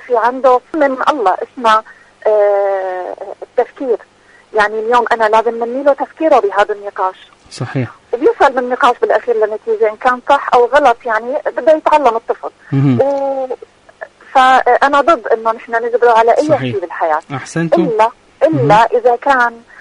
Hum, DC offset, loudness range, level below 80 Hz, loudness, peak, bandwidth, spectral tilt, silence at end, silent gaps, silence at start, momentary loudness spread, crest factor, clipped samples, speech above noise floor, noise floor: none; under 0.1%; 3 LU; -52 dBFS; -13 LUFS; 0 dBFS; 11 kHz; -6 dB/octave; 0.2 s; none; 0 s; 11 LU; 12 dB; under 0.1%; 22 dB; -34 dBFS